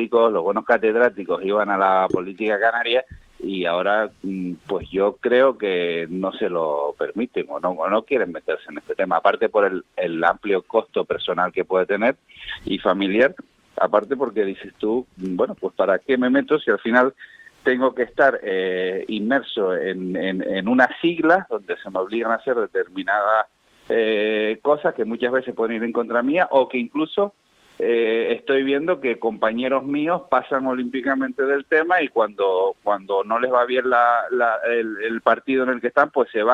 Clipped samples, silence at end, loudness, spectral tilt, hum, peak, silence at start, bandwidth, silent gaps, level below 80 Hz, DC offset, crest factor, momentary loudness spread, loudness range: under 0.1%; 0 s; -21 LUFS; -7 dB/octave; none; 0 dBFS; 0 s; 7.2 kHz; none; -60 dBFS; under 0.1%; 20 dB; 8 LU; 2 LU